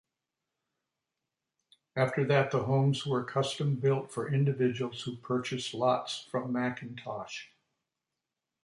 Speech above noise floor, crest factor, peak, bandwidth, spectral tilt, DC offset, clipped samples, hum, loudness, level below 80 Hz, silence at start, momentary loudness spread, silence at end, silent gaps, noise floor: 58 dB; 20 dB; -14 dBFS; 11.5 kHz; -6 dB/octave; under 0.1%; under 0.1%; none; -31 LUFS; -72 dBFS; 1.95 s; 12 LU; 1.2 s; none; -88 dBFS